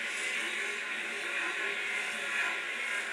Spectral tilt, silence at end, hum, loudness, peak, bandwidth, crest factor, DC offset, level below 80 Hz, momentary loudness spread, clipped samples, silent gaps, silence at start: 0.5 dB/octave; 0 s; none; -32 LUFS; -20 dBFS; 16.5 kHz; 14 dB; under 0.1%; -82 dBFS; 3 LU; under 0.1%; none; 0 s